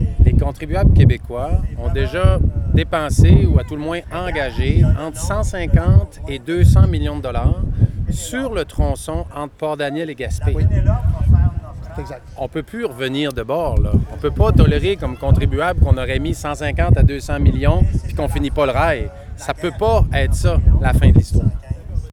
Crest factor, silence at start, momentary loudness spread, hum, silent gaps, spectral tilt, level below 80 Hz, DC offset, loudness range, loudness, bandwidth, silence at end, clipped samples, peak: 14 dB; 0 s; 12 LU; none; none; -7 dB/octave; -20 dBFS; under 0.1%; 4 LU; -17 LUFS; 13.5 kHz; 0 s; under 0.1%; 0 dBFS